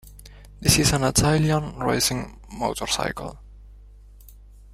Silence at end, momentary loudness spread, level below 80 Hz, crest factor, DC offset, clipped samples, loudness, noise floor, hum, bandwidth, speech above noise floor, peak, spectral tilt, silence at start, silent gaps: 0.4 s; 14 LU; -40 dBFS; 24 dB; under 0.1%; under 0.1%; -22 LUFS; -46 dBFS; 50 Hz at -40 dBFS; 16 kHz; 24 dB; -2 dBFS; -4 dB/octave; 0.05 s; none